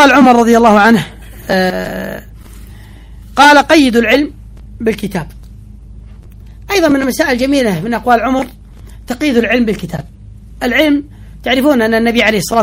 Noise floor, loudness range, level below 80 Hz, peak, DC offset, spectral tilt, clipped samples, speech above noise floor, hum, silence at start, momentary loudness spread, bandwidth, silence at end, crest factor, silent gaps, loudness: -33 dBFS; 4 LU; -34 dBFS; 0 dBFS; under 0.1%; -4.5 dB/octave; 0.5%; 23 dB; none; 0 s; 16 LU; 16.5 kHz; 0 s; 12 dB; none; -11 LUFS